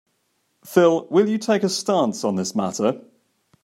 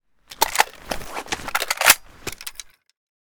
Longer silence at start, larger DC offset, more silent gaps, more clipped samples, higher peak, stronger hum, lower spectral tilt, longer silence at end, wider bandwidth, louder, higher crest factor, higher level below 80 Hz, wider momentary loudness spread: first, 0.65 s vs 0.3 s; neither; neither; neither; about the same, -2 dBFS vs 0 dBFS; neither; first, -5 dB/octave vs 0.5 dB/octave; about the same, 0.65 s vs 0.65 s; second, 16 kHz vs over 20 kHz; about the same, -20 LUFS vs -20 LUFS; about the same, 20 dB vs 24 dB; second, -72 dBFS vs -46 dBFS; second, 7 LU vs 19 LU